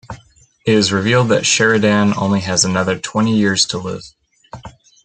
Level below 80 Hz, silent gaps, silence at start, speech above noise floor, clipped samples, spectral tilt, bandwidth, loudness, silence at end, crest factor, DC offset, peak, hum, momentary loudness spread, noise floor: -52 dBFS; none; 0.1 s; 34 dB; under 0.1%; -4 dB/octave; 9.4 kHz; -15 LUFS; 0.35 s; 16 dB; under 0.1%; 0 dBFS; none; 23 LU; -49 dBFS